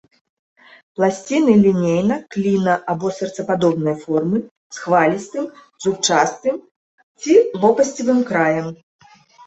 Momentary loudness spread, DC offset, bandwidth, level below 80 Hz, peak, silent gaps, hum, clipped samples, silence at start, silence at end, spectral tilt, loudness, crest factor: 13 LU; under 0.1%; 8.2 kHz; -60 dBFS; -2 dBFS; 4.51-4.70 s, 6.71-7.15 s; none; under 0.1%; 1 s; 0.7 s; -5.5 dB/octave; -18 LUFS; 16 dB